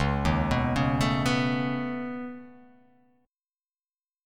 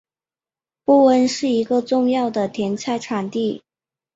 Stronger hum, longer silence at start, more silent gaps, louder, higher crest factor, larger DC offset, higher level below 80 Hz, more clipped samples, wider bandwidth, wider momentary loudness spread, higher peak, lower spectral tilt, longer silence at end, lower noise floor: neither; second, 0 s vs 0.9 s; neither; second, -27 LUFS vs -19 LUFS; about the same, 18 dB vs 16 dB; neither; first, -40 dBFS vs -64 dBFS; neither; first, 14.5 kHz vs 8 kHz; about the same, 12 LU vs 10 LU; second, -12 dBFS vs -4 dBFS; about the same, -6 dB/octave vs -5 dB/octave; first, 1.7 s vs 0.6 s; about the same, under -90 dBFS vs under -90 dBFS